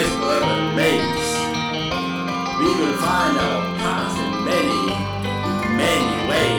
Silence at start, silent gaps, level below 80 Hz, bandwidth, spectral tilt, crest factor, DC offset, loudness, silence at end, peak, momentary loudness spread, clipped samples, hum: 0 s; none; -44 dBFS; over 20 kHz; -4.5 dB/octave; 14 dB; under 0.1%; -20 LUFS; 0 s; -6 dBFS; 5 LU; under 0.1%; none